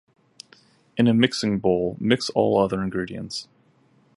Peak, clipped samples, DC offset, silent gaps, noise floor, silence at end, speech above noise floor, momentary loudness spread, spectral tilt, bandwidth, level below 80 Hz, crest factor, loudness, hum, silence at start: -2 dBFS; under 0.1%; under 0.1%; none; -60 dBFS; 0.75 s; 38 dB; 13 LU; -5.5 dB/octave; 11.5 kHz; -54 dBFS; 22 dB; -22 LUFS; none; 0.95 s